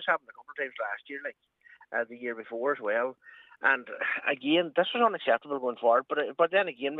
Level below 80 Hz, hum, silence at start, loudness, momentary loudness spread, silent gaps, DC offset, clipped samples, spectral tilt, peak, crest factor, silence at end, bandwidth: -88 dBFS; none; 0 s; -29 LUFS; 11 LU; none; under 0.1%; under 0.1%; -6.5 dB/octave; -10 dBFS; 20 dB; 0 s; 4.1 kHz